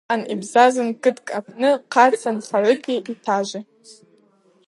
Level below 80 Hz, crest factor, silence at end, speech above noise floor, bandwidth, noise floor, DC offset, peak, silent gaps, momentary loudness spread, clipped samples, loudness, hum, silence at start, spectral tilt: -78 dBFS; 18 dB; 0.75 s; 38 dB; 11.5 kHz; -58 dBFS; under 0.1%; -2 dBFS; none; 12 LU; under 0.1%; -19 LUFS; none; 0.1 s; -4 dB/octave